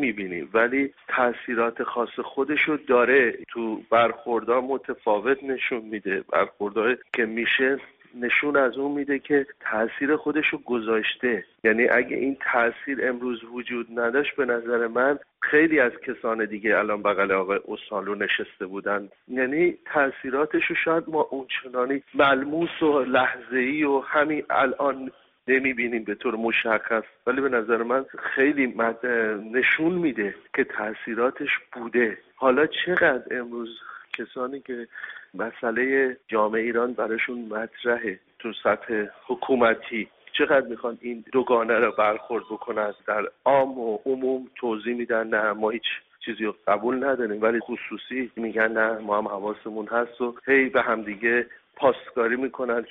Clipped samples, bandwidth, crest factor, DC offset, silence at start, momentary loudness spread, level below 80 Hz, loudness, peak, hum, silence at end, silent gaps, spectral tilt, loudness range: under 0.1%; 4 kHz; 18 dB; under 0.1%; 0 s; 10 LU; -66 dBFS; -24 LUFS; -6 dBFS; none; 0 s; none; -2 dB/octave; 3 LU